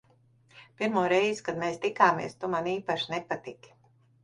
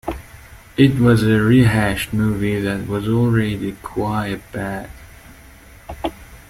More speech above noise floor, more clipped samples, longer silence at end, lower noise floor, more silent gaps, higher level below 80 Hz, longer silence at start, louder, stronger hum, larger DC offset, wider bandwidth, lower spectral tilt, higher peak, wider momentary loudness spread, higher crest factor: first, 35 dB vs 26 dB; neither; first, 0.7 s vs 0.1 s; first, -63 dBFS vs -43 dBFS; neither; second, -68 dBFS vs -38 dBFS; first, 0.55 s vs 0.05 s; second, -28 LUFS vs -18 LUFS; neither; neither; second, 11 kHz vs 15.5 kHz; second, -5 dB/octave vs -7 dB/octave; second, -6 dBFS vs -2 dBFS; second, 10 LU vs 16 LU; first, 24 dB vs 16 dB